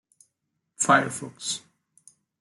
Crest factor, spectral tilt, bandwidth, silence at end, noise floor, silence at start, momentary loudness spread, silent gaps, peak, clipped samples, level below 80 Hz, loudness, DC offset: 22 dB; -2.5 dB/octave; 12.5 kHz; 0.85 s; -79 dBFS; 0.8 s; 12 LU; none; -6 dBFS; under 0.1%; -76 dBFS; -25 LUFS; under 0.1%